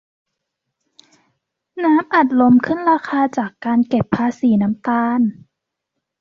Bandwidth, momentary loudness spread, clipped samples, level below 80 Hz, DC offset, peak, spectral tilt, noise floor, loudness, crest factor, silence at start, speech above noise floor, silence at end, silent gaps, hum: 7 kHz; 7 LU; under 0.1%; -56 dBFS; under 0.1%; -2 dBFS; -8 dB/octave; -78 dBFS; -17 LUFS; 16 dB; 1.75 s; 63 dB; 0.9 s; none; none